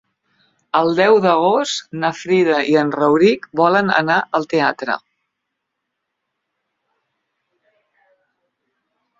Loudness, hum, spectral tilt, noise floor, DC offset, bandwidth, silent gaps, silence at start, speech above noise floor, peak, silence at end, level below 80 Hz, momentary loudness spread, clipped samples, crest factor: -16 LUFS; none; -5 dB/octave; -77 dBFS; under 0.1%; 7.8 kHz; none; 0.75 s; 62 dB; -2 dBFS; 4.2 s; -64 dBFS; 9 LU; under 0.1%; 18 dB